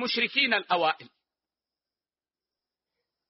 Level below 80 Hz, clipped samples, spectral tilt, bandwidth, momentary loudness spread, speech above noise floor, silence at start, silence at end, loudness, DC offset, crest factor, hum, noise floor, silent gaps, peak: -78 dBFS; under 0.1%; 0.5 dB/octave; 5.8 kHz; 6 LU; over 63 dB; 0 s; 2.2 s; -25 LUFS; under 0.1%; 22 dB; none; under -90 dBFS; none; -8 dBFS